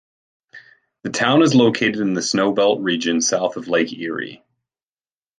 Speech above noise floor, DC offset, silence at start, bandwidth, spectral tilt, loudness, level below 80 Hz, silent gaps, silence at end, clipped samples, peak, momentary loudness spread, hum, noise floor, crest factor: over 72 dB; under 0.1%; 0.55 s; 10 kHz; -4 dB/octave; -18 LUFS; -64 dBFS; none; 1.05 s; under 0.1%; -2 dBFS; 12 LU; none; under -90 dBFS; 18 dB